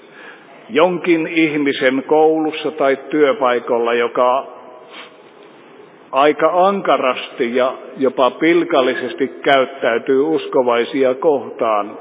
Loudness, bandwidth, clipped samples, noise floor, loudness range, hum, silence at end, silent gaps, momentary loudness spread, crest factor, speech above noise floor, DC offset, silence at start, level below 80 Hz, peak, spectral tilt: -16 LUFS; 4 kHz; under 0.1%; -42 dBFS; 3 LU; none; 0 s; none; 7 LU; 16 dB; 27 dB; under 0.1%; 0.15 s; -76 dBFS; 0 dBFS; -9 dB/octave